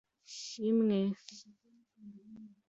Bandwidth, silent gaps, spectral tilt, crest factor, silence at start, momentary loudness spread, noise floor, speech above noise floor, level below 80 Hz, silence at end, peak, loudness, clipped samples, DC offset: 7.8 kHz; none; -6 dB/octave; 14 dB; 0.3 s; 25 LU; -57 dBFS; 25 dB; -80 dBFS; 0.2 s; -22 dBFS; -33 LUFS; under 0.1%; under 0.1%